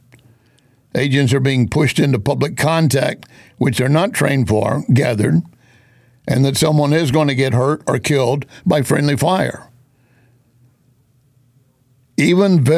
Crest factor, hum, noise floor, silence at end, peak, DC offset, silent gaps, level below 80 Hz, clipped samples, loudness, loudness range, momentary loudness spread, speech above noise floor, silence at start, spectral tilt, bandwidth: 14 dB; none; -56 dBFS; 0 s; -4 dBFS; under 0.1%; none; -44 dBFS; under 0.1%; -16 LUFS; 5 LU; 6 LU; 42 dB; 0.95 s; -6 dB/octave; 15.5 kHz